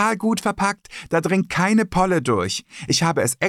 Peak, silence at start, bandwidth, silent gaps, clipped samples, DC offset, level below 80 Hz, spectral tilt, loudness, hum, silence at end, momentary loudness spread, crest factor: -8 dBFS; 0 s; 16 kHz; none; under 0.1%; under 0.1%; -48 dBFS; -4.5 dB/octave; -20 LUFS; none; 0 s; 6 LU; 14 dB